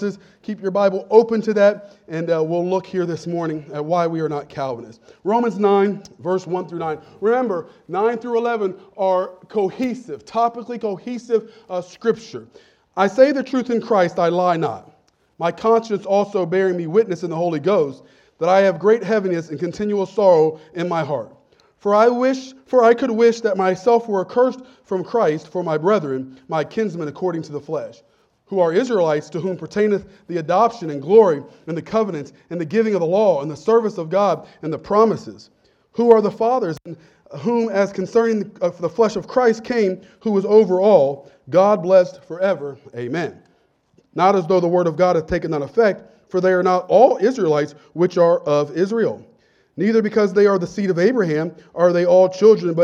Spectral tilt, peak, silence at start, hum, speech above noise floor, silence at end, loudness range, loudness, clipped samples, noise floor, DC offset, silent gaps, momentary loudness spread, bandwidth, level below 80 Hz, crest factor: -7 dB/octave; 0 dBFS; 0 s; none; 42 dB; 0 s; 5 LU; -19 LUFS; under 0.1%; -60 dBFS; under 0.1%; none; 13 LU; 7.8 kHz; -58 dBFS; 18 dB